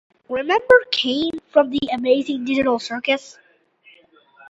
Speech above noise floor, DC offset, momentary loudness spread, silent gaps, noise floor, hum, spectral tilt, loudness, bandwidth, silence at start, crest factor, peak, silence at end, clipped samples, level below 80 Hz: 35 dB; under 0.1%; 9 LU; none; -54 dBFS; none; -3.5 dB/octave; -19 LUFS; 8 kHz; 0.3 s; 20 dB; 0 dBFS; 1.2 s; under 0.1%; -56 dBFS